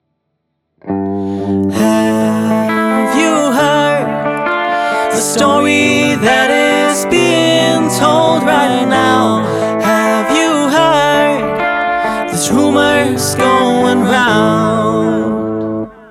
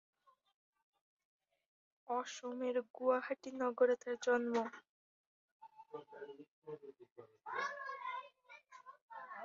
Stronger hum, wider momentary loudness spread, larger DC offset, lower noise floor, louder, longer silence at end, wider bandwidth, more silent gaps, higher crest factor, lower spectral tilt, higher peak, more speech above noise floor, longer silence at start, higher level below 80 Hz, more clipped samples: neither; second, 6 LU vs 24 LU; neither; first, -68 dBFS vs -62 dBFS; first, -12 LUFS vs -39 LUFS; first, 0.15 s vs 0 s; first, 16.5 kHz vs 7.4 kHz; second, none vs 2.90-2.94 s, 4.89-5.60 s, 6.48-6.62 s, 7.12-7.16 s, 9.02-9.08 s; second, 12 dB vs 22 dB; first, -4 dB/octave vs -2 dB/octave; first, 0 dBFS vs -20 dBFS; first, 58 dB vs 22 dB; second, 0.85 s vs 2.1 s; first, -48 dBFS vs under -90 dBFS; neither